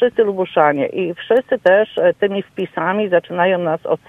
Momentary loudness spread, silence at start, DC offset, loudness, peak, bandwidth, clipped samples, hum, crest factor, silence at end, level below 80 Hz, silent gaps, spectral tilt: 7 LU; 0 s; under 0.1%; -17 LUFS; 0 dBFS; 4.3 kHz; under 0.1%; none; 16 dB; 0.1 s; -62 dBFS; none; -7.5 dB/octave